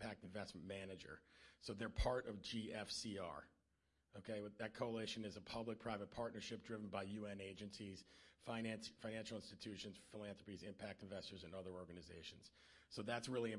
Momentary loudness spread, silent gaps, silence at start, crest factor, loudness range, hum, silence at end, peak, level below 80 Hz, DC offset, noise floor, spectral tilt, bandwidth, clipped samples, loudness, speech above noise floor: 12 LU; none; 0 s; 22 dB; 5 LU; none; 0 s; -28 dBFS; -62 dBFS; under 0.1%; -85 dBFS; -4.5 dB/octave; 11.5 kHz; under 0.1%; -50 LUFS; 35 dB